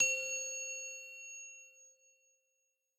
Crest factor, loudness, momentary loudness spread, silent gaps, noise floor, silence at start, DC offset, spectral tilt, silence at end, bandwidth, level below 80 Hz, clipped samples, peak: 22 dB; -38 LUFS; 18 LU; none; -83 dBFS; 0 s; under 0.1%; 2.5 dB/octave; 1.05 s; 15.5 kHz; under -90 dBFS; under 0.1%; -18 dBFS